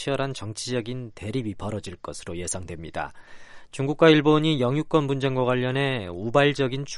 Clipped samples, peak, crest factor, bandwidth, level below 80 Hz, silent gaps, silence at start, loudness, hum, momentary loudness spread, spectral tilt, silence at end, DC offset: under 0.1%; -4 dBFS; 20 dB; 11.5 kHz; -52 dBFS; none; 0 s; -24 LUFS; none; 16 LU; -5.5 dB/octave; 0 s; under 0.1%